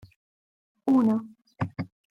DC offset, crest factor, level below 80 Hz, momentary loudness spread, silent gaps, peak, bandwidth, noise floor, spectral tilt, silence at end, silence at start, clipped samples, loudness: under 0.1%; 16 dB; -66 dBFS; 13 LU; none; -14 dBFS; 6.4 kHz; under -90 dBFS; -9 dB/octave; 0.25 s; 0.85 s; under 0.1%; -26 LUFS